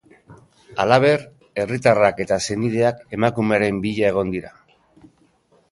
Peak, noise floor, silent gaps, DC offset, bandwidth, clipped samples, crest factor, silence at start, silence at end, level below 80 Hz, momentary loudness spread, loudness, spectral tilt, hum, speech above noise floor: 0 dBFS; -59 dBFS; none; under 0.1%; 11.5 kHz; under 0.1%; 20 dB; 0.3 s; 1.2 s; -52 dBFS; 11 LU; -19 LUFS; -5.5 dB/octave; none; 40 dB